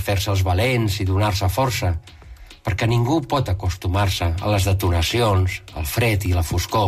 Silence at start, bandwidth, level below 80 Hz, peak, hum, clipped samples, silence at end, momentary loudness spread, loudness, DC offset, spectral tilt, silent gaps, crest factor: 0 s; 15.5 kHz; -34 dBFS; -10 dBFS; none; under 0.1%; 0 s; 6 LU; -21 LUFS; under 0.1%; -5.5 dB/octave; none; 10 dB